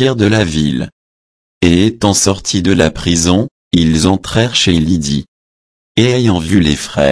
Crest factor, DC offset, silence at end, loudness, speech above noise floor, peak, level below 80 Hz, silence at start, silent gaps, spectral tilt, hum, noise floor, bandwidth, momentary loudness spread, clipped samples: 12 dB; under 0.1%; 0 s; -12 LUFS; over 79 dB; 0 dBFS; -32 dBFS; 0 s; 0.92-1.61 s, 3.51-3.71 s, 5.28-5.95 s; -4.5 dB/octave; none; under -90 dBFS; 11 kHz; 5 LU; under 0.1%